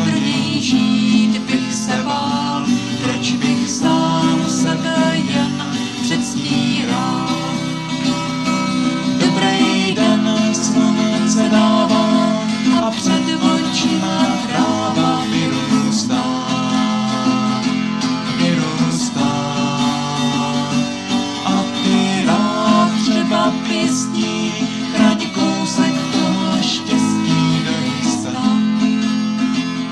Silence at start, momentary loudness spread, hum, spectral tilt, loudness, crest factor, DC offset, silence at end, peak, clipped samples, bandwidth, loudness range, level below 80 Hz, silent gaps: 0 s; 5 LU; none; -4.5 dB/octave; -17 LUFS; 16 dB; 0.1%; 0 s; -2 dBFS; under 0.1%; 12 kHz; 3 LU; -54 dBFS; none